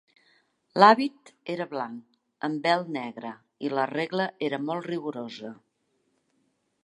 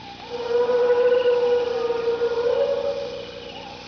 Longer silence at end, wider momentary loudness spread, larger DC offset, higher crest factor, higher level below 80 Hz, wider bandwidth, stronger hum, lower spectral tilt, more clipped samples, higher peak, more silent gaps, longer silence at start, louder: first, 1.3 s vs 0 s; first, 21 LU vs 15 LU; neither; first, 26 dB vs 12 dB; second, -82 dBFS vs -56 dBFS; first, 11 kHz vs 5.4 kHz; second, none vs 60 Hz at -50 dBFS; first, -6 dB/octave vs -4.5 dB/octave; neither; first, -2 dBFS vs -10 dBFS; neither; first, 0.75 s vs 0 s; second, -26 LUFS vs -22 LUFS